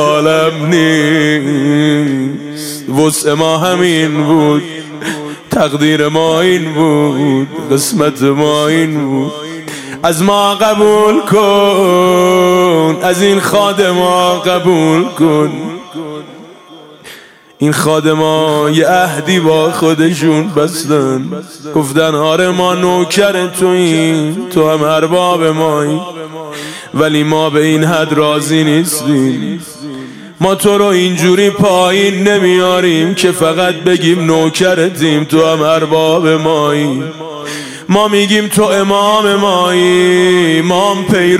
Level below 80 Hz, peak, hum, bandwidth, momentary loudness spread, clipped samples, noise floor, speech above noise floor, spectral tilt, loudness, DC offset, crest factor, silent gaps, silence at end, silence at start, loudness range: -52 dBFS; 0 dBFS; none; 16 kHz; 11 LU; under 0.1%; -36 dBFS; 26 dB; -5 dB/octave; -10 LUFS; under 0.1%; 10 dB; none; 0 s; 0 s; 3 LU